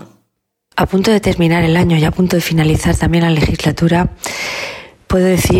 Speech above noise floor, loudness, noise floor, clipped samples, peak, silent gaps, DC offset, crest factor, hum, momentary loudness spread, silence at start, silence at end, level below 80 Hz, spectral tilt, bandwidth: 56 dB; -14 LUFS; -69 dBFS; under 0.1%; -2 dBFS; none; under 0.1%; 10 dB; none; 9 LU; 0 s; 0 s; -28 dBFS; -6 dB/octave; 16.5 kHz